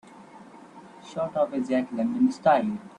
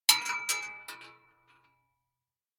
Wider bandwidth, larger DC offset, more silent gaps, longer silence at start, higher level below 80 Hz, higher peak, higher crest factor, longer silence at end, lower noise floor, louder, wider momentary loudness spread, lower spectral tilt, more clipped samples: second, 10 kHz vs 18 kHz; neither; neither; about the same, 0.15 s vs 0.1 s; about the same, -68 dBFS vs -72 dBFS; about the same, -8 dBFS vs -6 dBFS; second, 18 dB vs 30 dB; second, 0.1 s vs 1.45 s; second, -48 dBFS vs under -90 dBFS; first, -25 LUFS vs -29 LUFS; second, 11 LU vs 22 LU; first, -7 dB/octave vs 3 dB/octave; neither